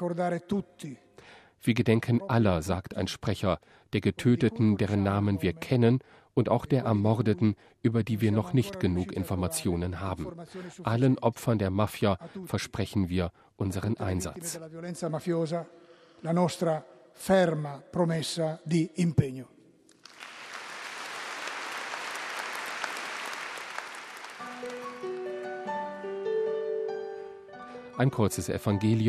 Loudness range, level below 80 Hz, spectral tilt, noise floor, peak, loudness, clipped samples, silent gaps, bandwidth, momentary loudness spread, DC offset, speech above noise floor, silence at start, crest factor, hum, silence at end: 9 LU; -56 dBFS; -6.5 dB/octave; -56 dBFS; -8 dBFS; -30 LUFS; under 0.1%; none; 14.5 kHz; 14 LU; under 0.1%; 29 dB; 0 s; 20 dB; none; 0 s